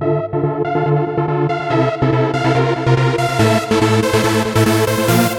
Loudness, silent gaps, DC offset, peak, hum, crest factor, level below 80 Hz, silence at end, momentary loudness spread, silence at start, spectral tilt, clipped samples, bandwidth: -15 LUFS; none; under 0.1%; -2 dBFS; none; 14 dB; -42 dBFS; 0 s; 4 LU; 0 s; -6 dB/octave; under 0.1%; 18 kHz